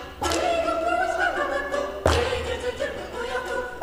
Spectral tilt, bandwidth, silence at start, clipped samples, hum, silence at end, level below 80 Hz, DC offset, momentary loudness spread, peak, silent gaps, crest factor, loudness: -4 dB/octave; 15.5 kHz; 0 s; under 0.1%; none; 0 s; -40 dBFS; under 0.1%; 7 LU; -4 dBFS; none; 22 dB; -25 LUFS